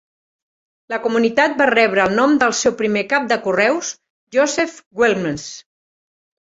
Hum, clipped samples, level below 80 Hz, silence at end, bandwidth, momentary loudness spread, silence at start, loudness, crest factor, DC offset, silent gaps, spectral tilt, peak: none; under 0.1%; -58 dBFS; 0.9 s; 8 kHz; 13 LU; 0.9 s; -17 LUFS; 18 dB; under 0.1%; 4.10-4.27 s, 4.86-4.91 s; -3.5 dB/octave; 0 dBFS